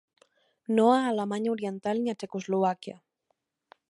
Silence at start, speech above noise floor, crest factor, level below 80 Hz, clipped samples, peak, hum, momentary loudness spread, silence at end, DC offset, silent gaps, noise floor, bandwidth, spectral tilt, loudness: 0.7 s; 51 dB; 20 dB; -80 dBFS; under 0.1%; -10 dBFS; none; 15 LU; 1 s; under 0.1%; none; -78 dBFS; 11.5 kHz; -6 dB/octave; -28 LUFS